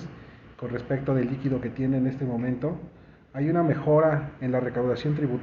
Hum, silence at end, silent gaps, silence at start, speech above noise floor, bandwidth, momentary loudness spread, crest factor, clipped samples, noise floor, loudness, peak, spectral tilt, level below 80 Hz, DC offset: none; 0 s; none; 0 s; 21 dB; 6.6 kHz; 17 LU; 16 dB; under 0.1%; -46 dBFS; -26 LUFS; -10 dBFS; -8 dB/octave; -54 dBFS; under 0.1%